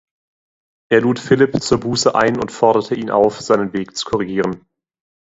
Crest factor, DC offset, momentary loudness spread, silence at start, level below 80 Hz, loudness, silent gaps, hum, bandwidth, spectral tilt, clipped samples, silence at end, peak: 18 dB; under 0.1%; 7 LU; 0.9 s; -50 dBFS; -17 LUFS; none; none; 8 kHz; -5 dB/octave; under 0.1%; 0.7 s; 0 dBFS